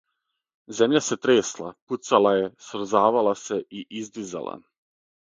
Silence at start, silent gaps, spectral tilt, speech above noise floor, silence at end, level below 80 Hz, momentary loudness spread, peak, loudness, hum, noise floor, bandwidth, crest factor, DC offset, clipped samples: 0.7 s; 1.82-1.87 s; -4 dB/octave; 56 dB; 0.65 s; -70 dBFS; 16 LU; -4 dBFS; -23 LUFS; none; -80 dBFS; 9.4 kHz; 22 dB; under 0.1%; under 0.1%